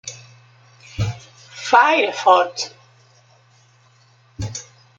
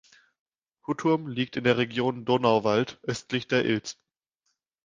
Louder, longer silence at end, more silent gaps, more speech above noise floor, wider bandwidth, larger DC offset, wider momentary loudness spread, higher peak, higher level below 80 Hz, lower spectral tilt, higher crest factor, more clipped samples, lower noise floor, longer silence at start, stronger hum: first, -18 LUFS vs -26 LUFS; second, 0.35 s vs 0.95 s; neither; second, 38 dB vs 52 dB; first, 16.5 kHz vs 9.6 kHz; neither; first, 23 LU vs 11 LU; first, -2 dBFS vs -6 dBFS; first, -50 dBFS vs -64 dBFS; second, -4 dB/octave vs -5.5 dB/octave; about the same, 20 dB vs 22 dB; neither; second, -54 dBFS vs -78 dBFS; second, 0.05 s vs 0.9 s; neither